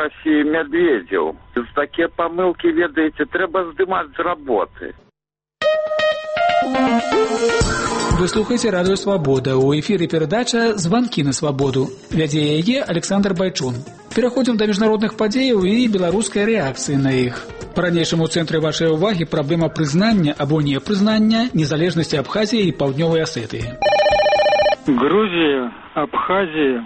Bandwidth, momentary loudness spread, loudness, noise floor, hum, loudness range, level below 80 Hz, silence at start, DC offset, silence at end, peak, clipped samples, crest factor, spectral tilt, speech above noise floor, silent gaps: 8.8 kHz; 6 LU; -18 LUFS; -87 dBFS; none; 3 LU; -40 dBFS; 0 s; under 0.1%; 0 s; -4 dBFS; under 0.1%; 14 dB; -5.5 dB/octave; 70 dB; none